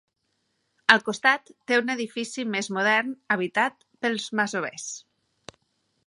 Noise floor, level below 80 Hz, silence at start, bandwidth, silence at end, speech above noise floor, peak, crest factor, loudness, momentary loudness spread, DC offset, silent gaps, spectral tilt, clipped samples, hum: -75 dBFS; -76 dBFS; 0.9 s; 11.5 kHz; 1.05 s; 50 dB; 0 dBFS; 26 dB; -24 LUFS; 11 LU; under 0.1%; none; -3 dB/octave; under 0.1%; none